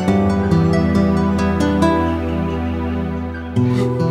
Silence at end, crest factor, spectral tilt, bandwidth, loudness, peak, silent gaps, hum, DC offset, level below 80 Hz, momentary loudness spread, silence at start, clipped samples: 0 s; 14 dB; -8 dB/octave; 11.5 kHz; -17 LUFS; -2 dBFS; none; none; under 0.1%; -30 dBFS; 7 LU; 0 s; under 0.1%